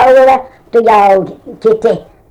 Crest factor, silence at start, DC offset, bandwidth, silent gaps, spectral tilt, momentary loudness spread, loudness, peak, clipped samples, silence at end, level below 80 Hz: 8 dB; 0 s; under 0.1%; 11 kHz; none; -6 dB/octave; 9 LU; -10 LUFS; 0 dBFS; under 0.1%; 0.3 s; -44 dBFS